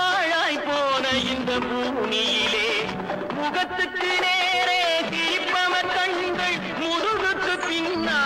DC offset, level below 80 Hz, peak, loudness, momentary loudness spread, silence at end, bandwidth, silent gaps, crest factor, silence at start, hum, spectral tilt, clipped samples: under 0.1%; -54 dBFS; -12 dBFS; -22 LUFS; 5 LU; 0 s; 16 kHz; none; 12 dB; 0 s; none; -2.5 dB/octave; under 0.1%